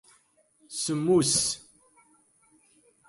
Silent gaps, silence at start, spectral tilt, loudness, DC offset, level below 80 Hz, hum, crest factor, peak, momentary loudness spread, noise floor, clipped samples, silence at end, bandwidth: none; 0.7 s; -3.5 dB/octave; -26 LUFS; under 0.1%; -62 dBFS; none; 18 dB; -12 dBFS; 15 LU; -65 dBFS; under 0.1%; 1.5 s; 11.5 kHz